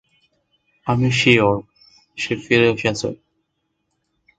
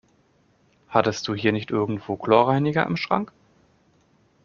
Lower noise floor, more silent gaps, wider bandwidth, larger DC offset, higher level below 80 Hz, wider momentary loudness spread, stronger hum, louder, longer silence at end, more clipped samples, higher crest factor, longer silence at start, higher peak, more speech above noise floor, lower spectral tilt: first, -73 dBFS vs -62 dBFS; neither; first, 9.2 kHz vs 7.2 kHz; neither; first, -52 dBFS vs -60 dBFS; first, 16 LU vs 8 LU; neither; first, -18 LUFS vs -23 LUFS; about the same, 1.25 s vs 1.2 s; neither; about the same, 20 dB vs 22 dB; about the same, 0.85 s vs 0.9 s; about the same, 0 dBFS vs -2 dBFS; first, 55 dB vs 40 dB; about the same, -5.5 dB/octave vs -6 dB/octave